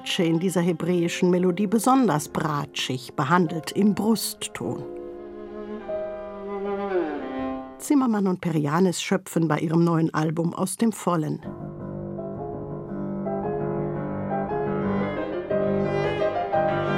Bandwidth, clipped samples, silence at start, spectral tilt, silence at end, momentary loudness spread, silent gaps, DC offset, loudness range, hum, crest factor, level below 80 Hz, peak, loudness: 16 kHz; under 0.1%; 0 s; -6 dB/octave; 0 s; 12 LU; none; under 0.1%; 7 LU; none; 20 dB; -54 dBFS; -4 dBFS; -25 LUFS